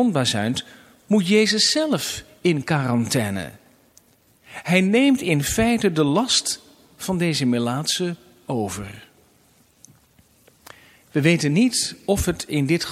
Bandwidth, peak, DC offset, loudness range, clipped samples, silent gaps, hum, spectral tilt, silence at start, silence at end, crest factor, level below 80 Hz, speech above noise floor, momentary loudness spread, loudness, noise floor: 16 kHz; -2 dBFS; under 0.1%; 7 LU; under 0.1%; none; none; -4.5 dB/octave; 0 s; 0 s; 20 dB; -46 dBFS; 37 dB; 12 LU; -21 LUFS; -58 dBFS